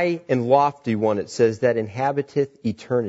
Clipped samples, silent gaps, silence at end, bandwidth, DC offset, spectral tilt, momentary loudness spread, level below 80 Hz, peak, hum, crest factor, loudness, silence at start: under 0.1%; none; 0 s; 8 kHz; under 0.1%; -7 dB/octave; 6 LU; -64 dBFS; -4 dBFS; none; 18 dB; -22 LUFS; 0 s